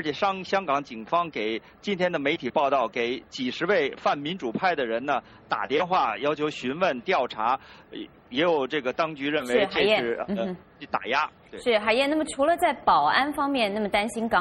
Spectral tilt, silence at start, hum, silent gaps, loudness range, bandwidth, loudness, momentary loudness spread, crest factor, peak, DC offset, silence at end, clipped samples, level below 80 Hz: -4.5 dB/octave; 0 s; none; none; 3 LU; 15 kHz; -25 LUFS; 9 LU; 18 dB; -6 dBFS; under 0.1%; 0 s; under 0.1%; -60 dBFS